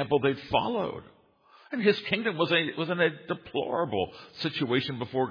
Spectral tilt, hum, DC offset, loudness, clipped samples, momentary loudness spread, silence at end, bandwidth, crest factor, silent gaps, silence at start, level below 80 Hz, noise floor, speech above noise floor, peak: -7 dB/octave; none; under 0.1%; -28 LUFS; under 0.1%; 10 LU; 0 s; 5.2 kHz; 20 dB; none; 0 s; -62 dBFS; -59 dBFS; 31 dB; -8 dBFS